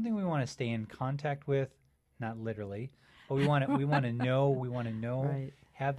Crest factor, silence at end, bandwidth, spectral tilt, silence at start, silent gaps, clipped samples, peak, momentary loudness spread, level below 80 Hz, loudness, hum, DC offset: 16 dB; 0 s; 10.5 kHz; -7.5 dB/octave; 0 s; none; under 0.1%; -16 dBFS; 12 LU; -66 dBFS; -33 LUFS; none; under 0.1%